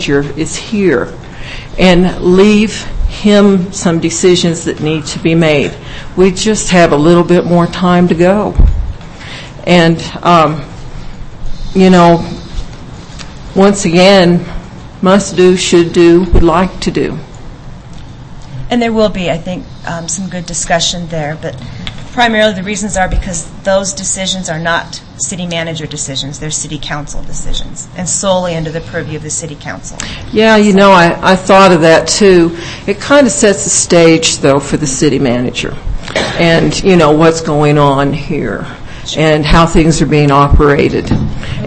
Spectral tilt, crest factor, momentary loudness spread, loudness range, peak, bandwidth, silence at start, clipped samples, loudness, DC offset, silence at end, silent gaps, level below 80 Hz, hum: -5 dB/octave; 10 dB; 17 LU; 9 LU; 0 dBFS; 11 kHz; 0 s; 1%; -10 LUFS; under 0.1%; 0 s; none; -22 dBFS; none